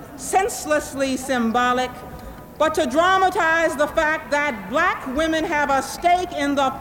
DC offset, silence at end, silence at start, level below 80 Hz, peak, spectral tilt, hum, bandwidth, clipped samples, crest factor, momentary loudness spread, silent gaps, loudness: under 0.1%; 0 s; 0 s; -46 dBFS; -6 dBFS; -3.5 dB/octave; none; 17 kHz; under 0.1%; 14 dB; 7 LU; none; -20 LUFS